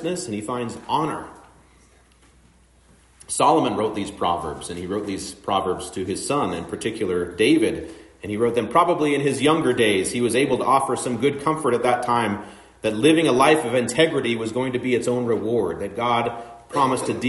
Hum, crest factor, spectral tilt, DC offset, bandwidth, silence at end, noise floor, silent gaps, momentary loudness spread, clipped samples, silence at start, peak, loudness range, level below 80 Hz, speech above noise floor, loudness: none; 18 dB; -4.5 dB/octave; under 0.1%; 11.5 kHz; 0 s; -55 dBFS; none; 11 LU; under 0.1%; 0 s; -4 dBFS; 6 LU; -56 dBFS; 34 dB; -22 LUFS